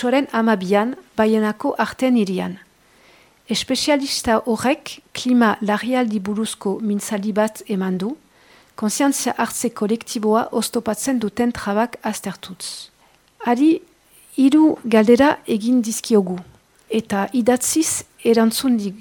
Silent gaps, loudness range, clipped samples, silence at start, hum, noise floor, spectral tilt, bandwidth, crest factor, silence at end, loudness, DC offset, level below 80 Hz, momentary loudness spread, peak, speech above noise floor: none; 5 LU; under 0.1%; 0 s; none; -56 dBFS; -4 dB/octave; 19 kHz; 18 dB; 0 s; -19 LUFS; under 0.1%; -56 dBFS; 10 LU; -2 dBFS; 37 dB